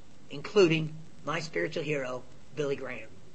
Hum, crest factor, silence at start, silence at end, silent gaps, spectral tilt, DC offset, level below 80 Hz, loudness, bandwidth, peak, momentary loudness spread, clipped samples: none; 20 dB; 0.3 s; 0.15 s; none; -5.5 dB/octave; 0.8%; -64 dBFS; -30 LUFS; 8.6 kHz; -12 dBFS; 18 LU; under 0.1%